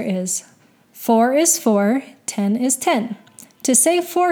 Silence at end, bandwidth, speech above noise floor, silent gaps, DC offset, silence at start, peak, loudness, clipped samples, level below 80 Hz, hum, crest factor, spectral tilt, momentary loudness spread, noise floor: 0 s; over 20 kHz; 29 dB; none; under 0.1%; 0 s; -2 dBFS; -18 LUFS; under 0.1%; -78 dBFS; none; 16 dB; -3.5 dB/octave; 12 LU; -46 dBFS